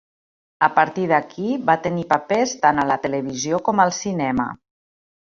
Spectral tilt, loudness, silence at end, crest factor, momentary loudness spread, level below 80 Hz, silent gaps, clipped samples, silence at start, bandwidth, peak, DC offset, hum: -4.5 dB/octave; -20 LUFS; 0.75 s; 20 dB; 7 LU; -56 dBFS; none; under 0.1%; 0.6 s; 7.6 kHz; -2 dBFS; under 0.1%; none